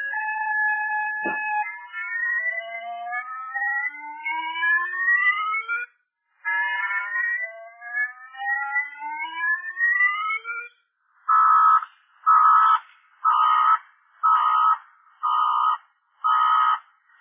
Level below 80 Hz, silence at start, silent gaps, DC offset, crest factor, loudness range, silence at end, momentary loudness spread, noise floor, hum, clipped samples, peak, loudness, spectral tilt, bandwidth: -86 dBFS; 0 s; none; under 0.1%; 16 dB; 7 LU; 0.4 s; 14 LU; -69 dBFS; none; under 0.1%; -8 dBFS; -22 LUFS; -3 dB/octave; 3.7 kHz